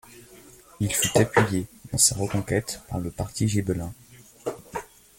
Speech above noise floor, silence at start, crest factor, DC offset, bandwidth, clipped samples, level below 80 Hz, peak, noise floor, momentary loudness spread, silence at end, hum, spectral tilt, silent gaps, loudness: 25 dB; 0.1 s; 22 dB; under 0.1%; 17 kHz; under 0.1%; -50 dBFS; -4 dBFS; -50 dBFS; 16 LU; 0.35 s; none; -4 dB/octave; none; -25 LUFS